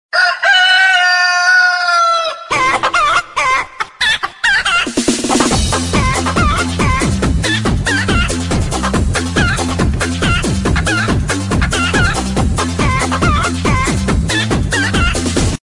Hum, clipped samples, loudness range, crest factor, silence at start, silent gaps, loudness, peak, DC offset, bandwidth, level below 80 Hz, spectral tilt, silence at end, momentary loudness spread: none; under 0.1%; 4 LU; 14 dB; 0.15 s; none; -13 LUFS; 0 dBFS; under 0.1%; 11.5 kHz; -24 dBFS; -4 dB/octave; 0.05 s; 7 LU